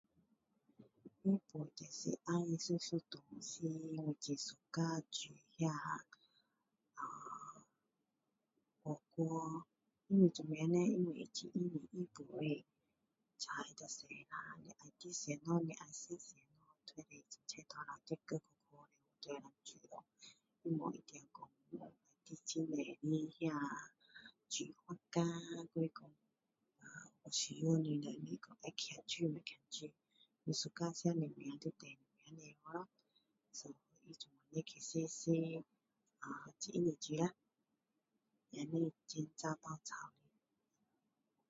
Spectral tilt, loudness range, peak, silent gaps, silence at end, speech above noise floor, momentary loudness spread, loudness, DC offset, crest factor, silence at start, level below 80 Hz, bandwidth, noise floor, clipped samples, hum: -6 dB/octave; 11 LU; -20 dBFS; none; 1.4 s; 45 dB; 18 LU; -43 LUFS; under 0.1%; 24 dB; 0.8 s; -86 dBFS; 7.6 kHz; -88 dBFS; under 0.1%; none